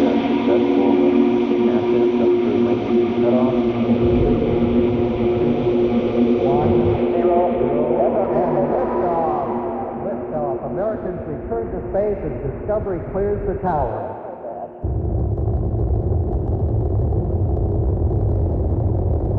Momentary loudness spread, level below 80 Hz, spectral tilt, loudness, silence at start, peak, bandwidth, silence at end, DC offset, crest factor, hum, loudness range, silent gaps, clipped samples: 9 LU; -30 dBFS; -10.5 dB/octave; -19 LUFS; 0 s; -4 dBFS; 5.8 kHz; 0 s; under 0.1%; 14 dB; none; 6 LU; none; under 0.1%